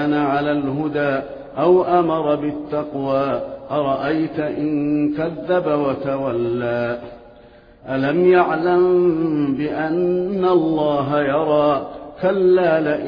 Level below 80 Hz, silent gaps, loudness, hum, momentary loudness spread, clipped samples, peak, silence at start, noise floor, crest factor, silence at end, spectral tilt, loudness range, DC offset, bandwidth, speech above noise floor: -52 dBFS; none; -19 LUFS; none; 9 LU; under 0.1%; -4 dBFS; 0 s; -46 dBFS; 14 dB; 0 s; -9.5 dB/octave; 4 LU; under 0.1%; 5.2 kHz; 28 dB